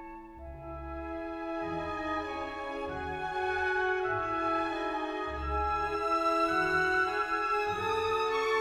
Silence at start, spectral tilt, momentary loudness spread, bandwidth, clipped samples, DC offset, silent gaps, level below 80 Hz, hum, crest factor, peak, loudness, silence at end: 0 s; -5 dB/octave; 12 LU; 15.5 kHz; under 0.1%; under 0.1%; none; -48 dBFS; none; 14 dB; -18 dBFS; -31 LUFS; 0 s